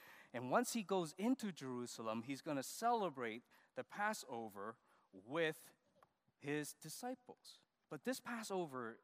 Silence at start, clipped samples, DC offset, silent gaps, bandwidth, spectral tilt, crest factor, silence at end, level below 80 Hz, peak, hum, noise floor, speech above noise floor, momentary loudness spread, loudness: 0 s; under 0.1%; under 0.1%; none; 15.5 kHz; -4 dB/octave; 22 dB; 0.05 s; under -90 dBFS; -22 dBFS; none; -76 dBFS; 32 dB; 15 LU; -44 LUFS